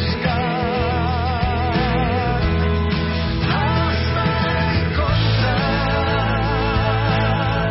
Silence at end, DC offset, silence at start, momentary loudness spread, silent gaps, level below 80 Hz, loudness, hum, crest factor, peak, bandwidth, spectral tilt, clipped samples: 0 s; under 0.1%; 0 s; 2 LU; none; -26 dBFS; -19 LUFS; none; 12 dB; -6 dBFS; 5.8 kHz; -10 dB/octave; under 0.1%